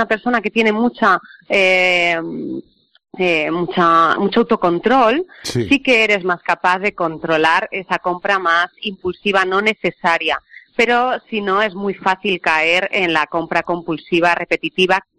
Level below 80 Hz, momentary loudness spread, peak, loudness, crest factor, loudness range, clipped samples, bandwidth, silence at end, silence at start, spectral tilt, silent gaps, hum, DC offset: -54 dBFS; 9 LU; -2 dBFS; -16 LUFS; 14 dB; 3 LU; under 0.1%; 13.5 kHz; 0.2 s; 0 s; -4.5 dB/octave; none; none; under 0.1%